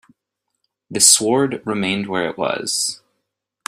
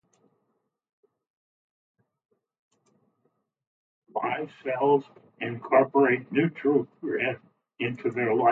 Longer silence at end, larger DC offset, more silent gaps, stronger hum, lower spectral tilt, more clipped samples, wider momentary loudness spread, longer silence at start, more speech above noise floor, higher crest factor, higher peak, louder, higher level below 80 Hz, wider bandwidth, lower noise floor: first, 0.7 s vs 0 s; neither; neither; neither; second, -2 dB/octave vs -9 dB/octave; neither; about the same, 12 LU vs 12 LU; second, 0.9 s vs 4.15 s; first, 59 dB vs 52 dB; about the same, 20 dB vs 20 dB; first, 0 dBFS vs -8 dBFS; first, -16 LUFS vs -26 LUFS; first, -62 dBFS vs -76 dBFS; first, 16 kHz vs 4.3 kHz; about the same, -78 dBFS vs -77 dBFS